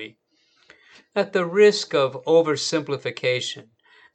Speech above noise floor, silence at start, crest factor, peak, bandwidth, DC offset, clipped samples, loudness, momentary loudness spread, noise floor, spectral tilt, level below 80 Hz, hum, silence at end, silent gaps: 43 dB; 0 s; 18 dB; -4 dBFS; 9 kHz; under 0.1%; under 0.1%; -21 LUFS; 13 LU; -64 dBFS; -4 dB/octave; -80 dBFS; none; 0.55 s; none